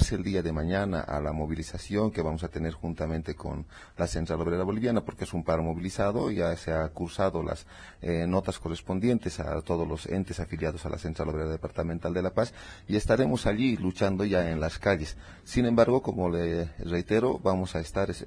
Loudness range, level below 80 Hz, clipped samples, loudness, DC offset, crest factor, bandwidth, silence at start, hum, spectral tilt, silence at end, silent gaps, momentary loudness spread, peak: 5 LU; -42 dBFS; under 0.1%; -29 LUFS; under 0.1%; 20 dB; 11 kHz; 0 s; none; -6.5 dB/octave; 0 s; none; 8 LU; -8 dBFS